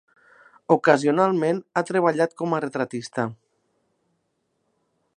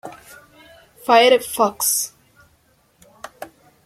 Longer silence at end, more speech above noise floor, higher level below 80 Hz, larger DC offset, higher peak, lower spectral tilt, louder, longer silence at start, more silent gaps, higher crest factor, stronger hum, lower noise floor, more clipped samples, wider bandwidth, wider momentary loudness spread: first, 1.8 s vs 0.4 s; first, 52 dB vs 43 dB; second, -76 dBFS vs -64 dBFS; neither; about the same, -2 dBFS vs -2 dBFS; first, -6 dB/octave vs -1 dB/octave; second, -22 LUFS vs -16 LUFS; first, 0.7 s vs 0.05 s; neither; about the same, 24 dB vs 20 dB; neither; first, -73 dBFS vs -59 dBFS; neither; second, 10.5 kHz vs 16.5 kHz; second, 10 LU vs 27 LU